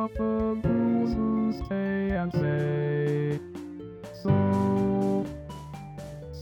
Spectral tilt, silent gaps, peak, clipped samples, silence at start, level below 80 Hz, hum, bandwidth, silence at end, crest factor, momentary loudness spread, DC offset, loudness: -9 dB/octave; none; -10 dBFS; under 0.1%; 0 s; -46 dBFS; none; 18 kHz; 0 s; 16 dB; 16 LU; under 0.1%; -27 LUFS